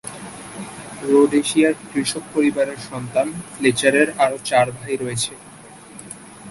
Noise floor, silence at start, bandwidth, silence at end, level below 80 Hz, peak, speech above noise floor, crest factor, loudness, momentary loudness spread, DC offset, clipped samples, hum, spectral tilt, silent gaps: -41 dBFS; 0.05 s; 12 kHz; 0 s; -58 dBFS; -2 dBFS; 22 dB; 20 dB; -19 LUFS; 20 LU; under 0.1%; under 0.1%; none; -4 dB/octave; none